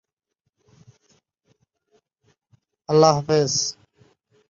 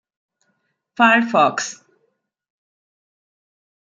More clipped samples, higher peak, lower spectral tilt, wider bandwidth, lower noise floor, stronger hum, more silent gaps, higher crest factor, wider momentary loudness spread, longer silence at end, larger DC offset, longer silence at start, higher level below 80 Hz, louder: neither; about the same, -2 dBFS vs -2 dBFS; about the same, -4.5 dB/octave vs -3.5 dB/octave; second, 7.6 kHz vs 9 kHz; first, -79 dBFS vs -70 dBFS; neither; neither; about the same, 24 dB vs 22 dB; second, 11 LU vs 15 LU; second, 0.8 s vs 2.25 s; neither; first, 2.9 s vs 1 s; first, -62 dBFS vs -76 dBFS; second, -19 LUFS vs -16 LUFS